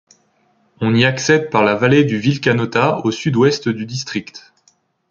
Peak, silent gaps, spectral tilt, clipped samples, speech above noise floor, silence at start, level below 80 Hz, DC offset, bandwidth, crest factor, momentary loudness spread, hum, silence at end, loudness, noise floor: 0 dBFS; none; -5.5 dB/octave; under 0.1%; 44 dB; 0.8 s; -54 dBFS; under 0.1%; 7.6 kHz; 16 dB; 10 LU; none; 0.7 s; -16 LUFS; -59 dBFS